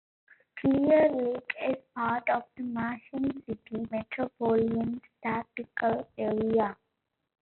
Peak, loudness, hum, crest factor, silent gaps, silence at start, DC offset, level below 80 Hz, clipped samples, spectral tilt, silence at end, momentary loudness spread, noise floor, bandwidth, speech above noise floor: -12 dBFS; -30 LUFS; none; 18 dB; none; 0.55 s; under 0.1%; -64 dBFS; under 0.1%; -5.5 dB/octave; 0.8 s; 12 LU; -82 dBFS; 4.3 kHz; 53 dB